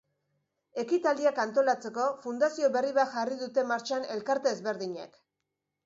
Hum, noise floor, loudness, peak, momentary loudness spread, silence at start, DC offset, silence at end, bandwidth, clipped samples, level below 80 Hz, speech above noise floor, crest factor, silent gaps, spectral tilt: none; -85 dBFS; -29 LUFS; -14 dBFS; 10 LU; 0.75 s; under 0.1%; 0.8 s; 7.8 kHz; under 0.1%; -82 dBFS; 56 dB; 16 dB; none; -4 dB/octave